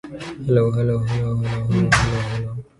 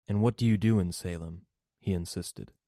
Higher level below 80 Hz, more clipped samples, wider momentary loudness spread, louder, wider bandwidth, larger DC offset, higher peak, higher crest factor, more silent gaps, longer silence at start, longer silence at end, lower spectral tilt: first, -38 dBFS vs -56 dBFS; neither; second, 10 LU vs 15 LU; first, -20 LUFS vs -30 LUFS; second, 11.5 kHz vs 14 kHz; neither; first, -2 dBFS vs -14 dBFS; about the same, 18 dB vs 16 dB; neither; about the same, 0.05 s vs 0.1 s; about the same, 0.15 s vs 0.2 s; about the same, -6 dB/octave vs -7 dB/octave